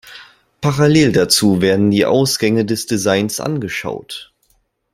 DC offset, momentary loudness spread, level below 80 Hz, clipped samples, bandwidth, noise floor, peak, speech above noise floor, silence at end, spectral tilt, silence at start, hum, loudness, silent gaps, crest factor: under 0.1%; 12 LU; -50 dBFS; under 0.1%; 16 kHz; -61 dBFS; 0 dBFS; 46 dB; 0.7 s; -4.5 dB/octave; 0.05 s; none; -15 LUFS; none; 16 dB